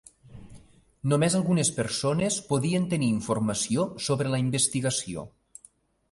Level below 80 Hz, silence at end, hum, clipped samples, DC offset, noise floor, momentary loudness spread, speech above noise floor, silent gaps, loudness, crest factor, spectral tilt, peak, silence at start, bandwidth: -58 dBFS; 0.85 s; none; under 0.1%; under 0.1%; -59 dBFS; 6 LU; 33 dB; none; -26 LUFS; 16 dB; -4.5 dB/octave; -12 dBFS; 0.3 s; 11.5 kHz